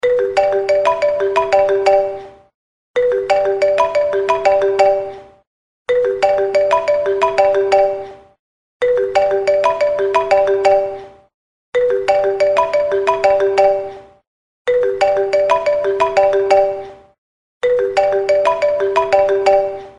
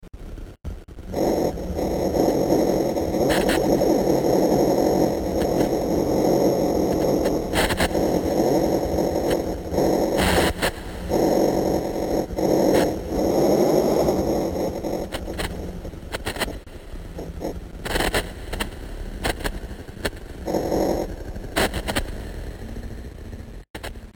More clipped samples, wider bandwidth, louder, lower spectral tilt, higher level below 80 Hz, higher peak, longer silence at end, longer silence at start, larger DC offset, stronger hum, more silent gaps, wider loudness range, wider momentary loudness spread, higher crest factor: neither; second, 10 kHz vs 17 kHz; first, -15 LUFS vs -22 LUFS; second, -4 dB/octave vs -5.5 dB/octave; second, -50 dBFS vs -36 dBFS; first, 0 dBFS vs -6 dBFS; about the same, 0.1 s vs 0 s; about the same, 0.05 s vs 0 s; neither; neither; first, 2.54-2.94 s, 5.47-5.85 s, 8.39-8.80 s, 11.34-11.73 s, 14.27-14.65 s, 17.18-17.61 s vs 23.70-23.74 s; second, 0 LU vs 8 LU; second, 7 LU vs 17 LU; about the same, 16 dB vs 16 dB